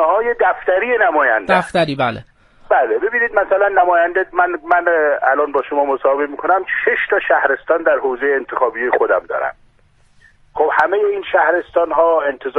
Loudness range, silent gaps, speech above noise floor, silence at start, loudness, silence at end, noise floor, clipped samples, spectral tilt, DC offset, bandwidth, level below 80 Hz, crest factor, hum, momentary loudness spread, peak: 3 LU; none; 37 dB; 0 s; -15 LUFS; 0 s; -52 dBFS; under 0.1%; -6 dB/octave; under 0.1%; 11.5 kHz; -52 dBFS; 16 dB; none; 5 LU; 0 dBFS